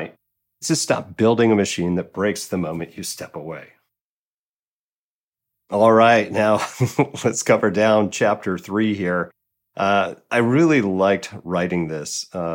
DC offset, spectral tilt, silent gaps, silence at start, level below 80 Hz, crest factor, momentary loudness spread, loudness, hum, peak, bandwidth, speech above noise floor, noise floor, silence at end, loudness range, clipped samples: under 0.1%; -5 dB/octave; 4.01-5.32 s; 0 s; -64 dBFS; 18 dB; 13 LU; -19 LUFS; none; -4 dBFS; 17 kHz; over 71 dB; under -90 dBFS; 0 s; 10 LU; under 0.1%